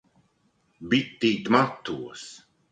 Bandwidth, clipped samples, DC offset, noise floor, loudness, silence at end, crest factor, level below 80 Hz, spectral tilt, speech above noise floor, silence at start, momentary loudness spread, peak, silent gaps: 9.2 kHz; under 0.1%; under 0.1%; -68 dBFS; -25 LUFS; 0.35 s; 24 dB; -64 dBFS; -5 dB/octave; 43 dB; 0.8 s; 20 LU; -2 dBFS; none